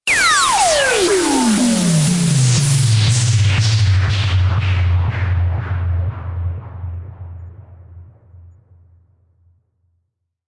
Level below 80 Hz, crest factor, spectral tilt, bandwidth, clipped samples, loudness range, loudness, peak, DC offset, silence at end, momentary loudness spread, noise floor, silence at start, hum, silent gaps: -38 dBFS; 14 dB; -4.5 dB/octave; 11.5 kHz; under 0.1%; 17 LU; -15 LUFS; -4 dBFS; under 0.1%; 2 s; 16 LU; -71 dBFS; 0.05 s; none; none